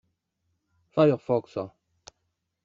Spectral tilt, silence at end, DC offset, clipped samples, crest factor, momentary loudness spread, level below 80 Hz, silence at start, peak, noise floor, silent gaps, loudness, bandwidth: -7 dB/octave; 0.95 s; under 0.1%; under 0.1%; 22 dB; 14 LU; -70 dBFS; 0.95 s; -8 dBFS; -79 dBFS; none; -26 LUFS; 7.4 kHz